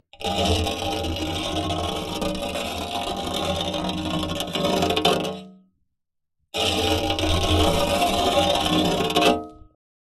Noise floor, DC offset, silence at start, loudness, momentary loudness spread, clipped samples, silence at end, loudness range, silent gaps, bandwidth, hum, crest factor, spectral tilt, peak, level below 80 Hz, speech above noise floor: -76 dBFS; under 0.1%; 0.15 s; -23 LUFS; 8 LU; under 0.1%; 0.5 s; 5 LU; none; 15 kHz; none; 20 dB; -4 dB/octave; -4 dBFS; -40 dBFS; 52 dB